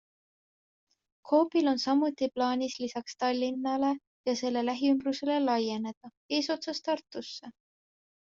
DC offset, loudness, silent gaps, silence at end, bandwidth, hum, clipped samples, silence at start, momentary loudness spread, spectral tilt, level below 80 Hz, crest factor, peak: under 0.1%; -30 LUFS; 4.07-4.24 s, 5.97-6.01 s, 6.17-6.29 s; 0.8 s; 7.6 kHz; none; under 0.1%; 1.25 s; 10 LU; -2.5 dB/octave; -76 dBFS; 18 dB; -12 dBFS